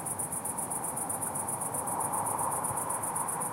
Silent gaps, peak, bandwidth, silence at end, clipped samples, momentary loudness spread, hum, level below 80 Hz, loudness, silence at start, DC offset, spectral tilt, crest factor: none; -18 dBFS; 16 kHz; 0 s; under 0.1%; 2 LU; none; -66 dBFS; -32 LUFS; 0 s; under 0.1%; -3.5 dB/octave; 16 dB